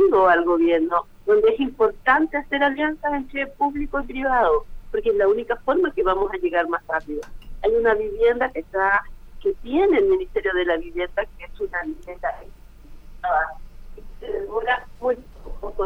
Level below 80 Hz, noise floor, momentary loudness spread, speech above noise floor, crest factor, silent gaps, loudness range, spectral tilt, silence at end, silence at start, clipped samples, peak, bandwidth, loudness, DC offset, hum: -40 dBFS; -41 dBFS; 12 LU; 20 dB; 18 dB; none; 7 LU; -6 dB/octave; 0 s; 0 s; under 0.1%; -4 dBFS; 6.4 kHz; -22 LUFS; under 0.1%; none